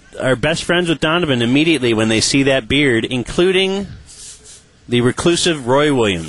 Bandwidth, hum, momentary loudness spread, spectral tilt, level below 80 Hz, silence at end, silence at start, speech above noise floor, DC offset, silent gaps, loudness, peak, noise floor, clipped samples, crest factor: 11.5 kHz; none; 9 LU; -4.5 dB/octave; -42 dBFS; 0 s; 0.15 s; 28 dB; 0.5%; none; -15 LUFS; -2 dBFS; -43 dBFS; under 0.1%; 14 dB